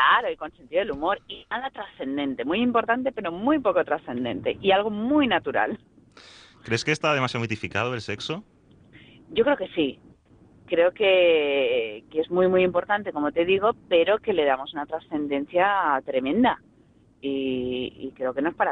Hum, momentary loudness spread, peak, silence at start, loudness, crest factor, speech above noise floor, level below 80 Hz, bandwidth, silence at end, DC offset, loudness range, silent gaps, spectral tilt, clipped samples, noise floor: none; 10 LU; -6 dBFS; 0 s; -24 LUFS; 18 dB; 33 dB; -58 dBFS; 10 kHz; 0 s; under 0.1%; 5 LU; none; -5.5 dB/octave; under 0.1%; -57 dBFS